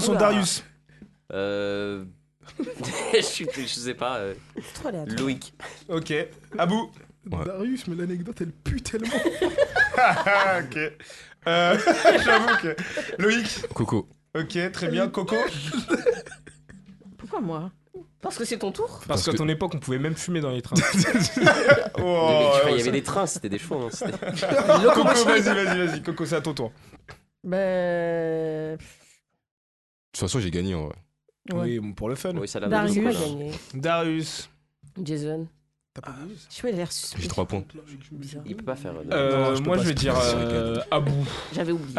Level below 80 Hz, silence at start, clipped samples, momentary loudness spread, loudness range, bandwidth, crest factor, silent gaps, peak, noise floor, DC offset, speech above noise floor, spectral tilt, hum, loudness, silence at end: -48 dBFS; 0 s; under 0.1%; 16 LU; 10 LU; 12.5 kHz; 22 dB; 29.51-30.12 s; -2 dBFS; -61 dBFS; under 0.1%; 37 dB; -4.5 dB/octave; none; -24 LUFS; 0 s